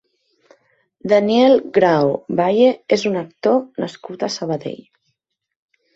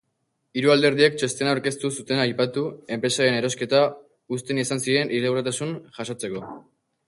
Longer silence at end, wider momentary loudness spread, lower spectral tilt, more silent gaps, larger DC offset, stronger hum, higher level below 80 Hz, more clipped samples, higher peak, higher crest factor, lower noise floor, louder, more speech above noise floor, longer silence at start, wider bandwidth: first, 1.2 s vs 0.45 s; about the same, 14 LU vs 13 LU; first, -6 dB/octave vs -4 dB/octave; neither; neither; neither; about the same, -62 dBFS vs -66 dBFS; neither; about the same, -2 dBFS vs -4 dBFS; about the same, 16 dB vs 20 dB; about the same, -73 dBFS vs -74 dBFS; first, -17 LUFS vs -23 LUFS; first, 56 dB vs 51 dB; first, 1.05 s vs 0.55 s; second, 7.8 kHz vs 11.5 kHz